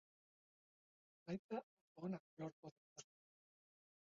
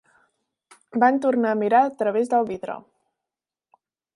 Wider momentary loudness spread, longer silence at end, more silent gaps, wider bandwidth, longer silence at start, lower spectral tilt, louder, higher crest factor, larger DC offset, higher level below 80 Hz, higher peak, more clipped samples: about the same, 14 LU vs 13 LU; second, 1.15 s vs 1.35 s; first, 1.39-1.49 s, 1.63-1.95 s, 2.20-2.37 s, 2.53-2.63 s, 2.72-2.96 s vs none; second, 7.2 kHz vs 11.5 kHz; first, 1.25 s vs 0.95 s; about the same, -7 dB/octave vs -6.5 dB/octave; second, -52 LUFS vs -21 LUFS; about the same, 20 dB vs 20 dB; neither; second, -86 dBFS vs -74 dBFS; second, -36 dBFS vs -4 dBFS; neither